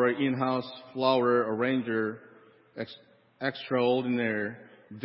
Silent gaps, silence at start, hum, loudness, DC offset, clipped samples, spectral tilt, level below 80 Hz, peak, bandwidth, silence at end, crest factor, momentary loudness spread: none; 0 s; none; -28 LUFS; under 0.1%; under 0.1%; -10 dB/octave; -76 dBFS; -10 dBFS; 5.8 kHz; 0 s; 18 dB; 16 LU